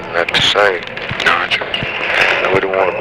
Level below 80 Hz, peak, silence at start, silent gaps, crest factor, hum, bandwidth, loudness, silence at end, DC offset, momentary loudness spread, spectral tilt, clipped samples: -44 dBFS; 0 dBFS; 0 s; none; 14 dB; none; 16 kHz; -13 LUFS; 0 s; 0.2%; 7 LU; -3 dB/octave; under 0.1%